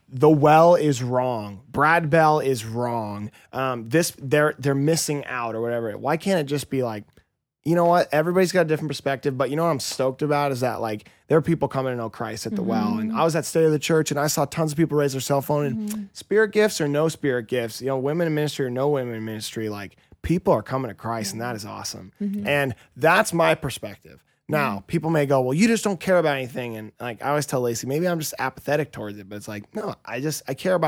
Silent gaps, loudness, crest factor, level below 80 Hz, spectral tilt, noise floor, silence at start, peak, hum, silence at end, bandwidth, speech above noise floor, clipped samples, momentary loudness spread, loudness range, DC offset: none; -23 LUFS; 18 dB; -56 dBFS; -5.5 dB/octave; -61 dBFS; 0.1 s; -4 dBFS; none; 0 s; 18 kHz; 39 dB; under 0.1%; 13 LU; 4 LU; under 0.1%